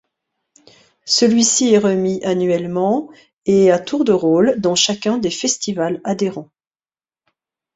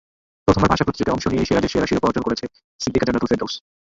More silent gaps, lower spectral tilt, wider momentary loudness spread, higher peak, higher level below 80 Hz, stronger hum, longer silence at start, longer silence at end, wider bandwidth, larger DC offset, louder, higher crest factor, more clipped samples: second, 3.33-3.42 s vs 2.64-2.79 s; second, -4 dB/octave vs -6 dB/octave; about the same, 8 LU vs 10 LU; about the same, -2 dBFS vs -2 dBFS; second, -58 dBFS vs -38 dBFS; neither; first, 1.05 s vs 0.45 s; first, 1.3 s vs 0.4 s; about the same, 8.4 kHz vs 8 kHz; neither; first, -16 LUFS vs -20 LUFS; about the same, 16 dB vs 18 dB; neither